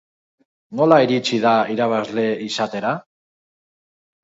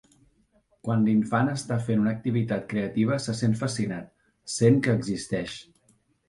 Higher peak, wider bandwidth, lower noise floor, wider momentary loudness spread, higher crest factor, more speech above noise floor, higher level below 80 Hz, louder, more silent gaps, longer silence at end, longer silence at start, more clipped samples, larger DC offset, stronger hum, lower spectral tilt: first, 0 dBFS vs -6 dBFS; second, 8 kHz vs 11.5 kHz; first, under -90 dBFS vs -66 dBFS; about the same, 10 LU vs 12 LU; about the same, 20 dB vs 20 dB; first, over 72 dB vs 41 dB; second, -68 dBFS vs -58 dBFS; first, -19 LUFS vs -26 LUFS; neither; first, 1.25 s vs 0.65 s; second, 0.7 s vs 0.85 s; neither; neither; neither; about the same, -5.5 dB/octave vs -6.5 dB/octave